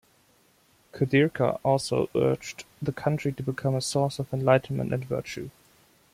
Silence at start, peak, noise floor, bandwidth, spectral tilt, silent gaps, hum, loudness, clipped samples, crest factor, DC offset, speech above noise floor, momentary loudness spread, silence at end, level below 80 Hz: 0.95 s; -8 dBFS; -63 dBFS; 15.5 kHz; -6 dB/octave; none; none; -27 LUFS; under 0.1%; 20 dB; under 0.1%; 37 dB; 11 LU; 0.65 s; -58 dBFS